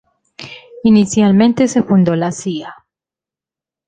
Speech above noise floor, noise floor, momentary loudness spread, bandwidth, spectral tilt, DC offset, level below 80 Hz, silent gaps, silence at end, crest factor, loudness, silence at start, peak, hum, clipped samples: 76 dB; -89 dBFS; 21 LU; 9.4 kHz; -6.5 dB/octave; under 0.1%; -52 dBFS; none; 1.15 s; 14 dB; -13 LUFS; 0.4 s; -2 dBFS; none; under 0.1%